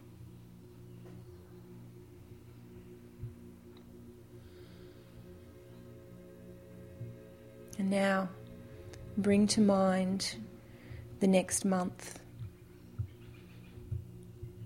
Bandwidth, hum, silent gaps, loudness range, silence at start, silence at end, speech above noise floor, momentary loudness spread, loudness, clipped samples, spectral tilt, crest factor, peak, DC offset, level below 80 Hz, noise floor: 16.5 kHz; 60 Hz at -65 dBFS; none; 21 LU; 0 s; 0 s; 24 dB; 25 LU; -32 LUFS; under 0.1%; -5 dB/octave; 22 dB; -14 dBFS; under 0.1%; -62 dBFS; -54 dBFS